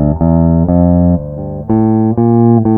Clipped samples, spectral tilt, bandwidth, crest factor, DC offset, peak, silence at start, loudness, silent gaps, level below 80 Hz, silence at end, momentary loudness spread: under 0.1%; -15.5 dB/octave; 2.4 kHz; 10 dB; under 0.1%; 0 dBFS; 0 s; -11 LUFS; none; -26 dBFS; 0 s; 7 LU